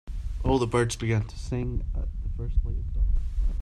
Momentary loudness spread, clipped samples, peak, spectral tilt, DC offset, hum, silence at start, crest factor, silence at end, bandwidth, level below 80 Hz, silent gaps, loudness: 9 LU; under 0.1%; -10 dBFS; -6.5 dB/octave; under 0.1%; none; 0.05 s; 16 dB; 0 s; 11.5 kHz; -28 dBFS; none; -29 LUFS